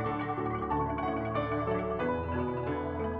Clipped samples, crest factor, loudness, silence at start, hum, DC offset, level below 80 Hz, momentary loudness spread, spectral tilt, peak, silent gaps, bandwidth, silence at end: under 0.1%; 14 dB; -32 LUFS; 0 s; none; under 0.1%; -48 dBFS; 2 LU; -10 dB/octave; -18 dBFS; none; 5.4 kHz; 0 s